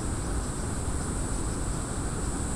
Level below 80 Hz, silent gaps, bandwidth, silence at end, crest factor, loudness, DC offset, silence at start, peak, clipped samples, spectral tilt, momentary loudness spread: -34 dBFS; none; 15 kHz; 0 s; 14 dB; -32 LUFS; under 0.1%; 0 s; -16 dBFS; under 0.1%; -5 dB/octave; 1 LU